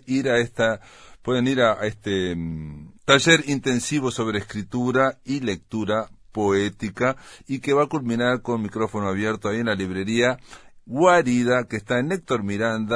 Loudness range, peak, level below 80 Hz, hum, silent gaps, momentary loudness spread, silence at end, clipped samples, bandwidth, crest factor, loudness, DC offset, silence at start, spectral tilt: 3 LU; 0 dBFS; -52 dBFS; none; none; 12 LU; 0 s; under 0.1%; 11 kHz; 22 dB; -22 LUFS; under 0.1%; 0.05 s; -5 dB/octave